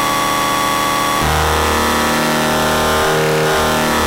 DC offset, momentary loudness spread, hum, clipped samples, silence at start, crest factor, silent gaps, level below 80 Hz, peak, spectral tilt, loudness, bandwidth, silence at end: under 0.1%; 1 LU; none; under 0.1%; 0 s; 8 dB; none; -30 dBFS; -6 dBFS; -3.5 dB/octave; -14 LUFS; 16 kHz; 0 s